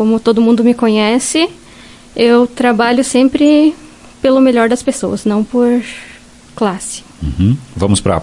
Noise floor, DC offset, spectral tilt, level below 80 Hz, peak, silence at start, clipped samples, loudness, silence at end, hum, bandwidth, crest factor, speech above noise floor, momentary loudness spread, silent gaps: -37 dBFS; under 0.1%; -5 dB/octave; -38 dBFS; 0 dBFS; 0 s; under 0.1%; -12 LUFS; 0 s; none; 11.5 kHz; 12 dB; 26 dB; 12 LU; none